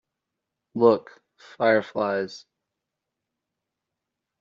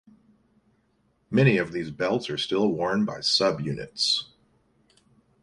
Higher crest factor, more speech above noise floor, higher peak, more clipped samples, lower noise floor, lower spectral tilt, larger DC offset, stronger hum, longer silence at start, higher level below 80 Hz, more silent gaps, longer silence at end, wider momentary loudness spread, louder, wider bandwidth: about the same, 22 dB vs 20 dB; first, 62 dB vs 43 dB; about the same, -4 dBFS vs -6 dBFS; neither; first, -84 dBFS vs -68 dBFS; about the same, -4 dB/octave vs -5 dB/octave; neither; neither; second, 0.75 s vs 1.3 s; second, -74 dBFS vs -62 dBFS; neither; first, 2.05 s vs 1.2 s; first, 16 LU vs 9 LU; about the same, -23 LUFS vs -25 LUFS; second, 7.4 kHz vs 11.5 kHz